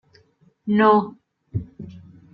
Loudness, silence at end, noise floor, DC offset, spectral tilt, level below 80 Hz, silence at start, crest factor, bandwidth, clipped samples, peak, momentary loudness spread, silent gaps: -20 LUFS; 0.35 s; -59 dBFS; under 0.1%; -9.5 dB/octave; -56 dBFS; 0.65 s; 18 dB; 5.4 kHz; under 0.1%; -4 dBFS; 24 LU; none